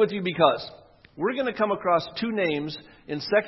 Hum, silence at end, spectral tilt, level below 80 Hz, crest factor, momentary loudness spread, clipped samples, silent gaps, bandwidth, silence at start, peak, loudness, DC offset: none; 0 s; -7 dB/octave; -64 dBFS; 22 dB; 13 LU; under 0.1%; none; 6 kHz; 0 s; -4 dBFS; -26 LUFS; under 0.1%